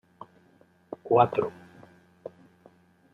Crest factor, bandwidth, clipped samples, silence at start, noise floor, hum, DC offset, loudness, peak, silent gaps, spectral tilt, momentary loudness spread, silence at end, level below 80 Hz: 24 dB; 5.8 kHz; under 0.1%; 0.9 s; -61 dBFS; none; under 0.1%; -25 LUFS; -6 dBFS; none; -8.5 dB/octave; 28 LU; 1.65 s; -74 dBFS